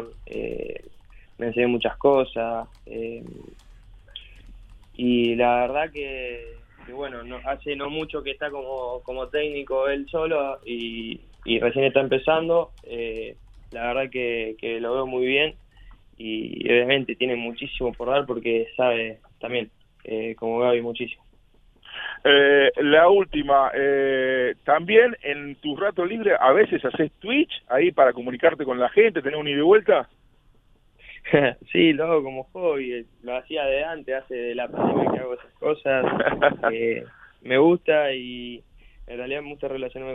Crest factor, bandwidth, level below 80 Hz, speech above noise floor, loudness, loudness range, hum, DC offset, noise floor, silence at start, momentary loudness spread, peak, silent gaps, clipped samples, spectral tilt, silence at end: 22 dB; 4 kHz; -50 dBFS; 35 dB; -23 LUFS; 8 LU; none; under 0.1%; -57 dBFS; 0 s; 16 LU; -2 dBFS; none; under 0.1%; -7.5 dB/octave; 0 s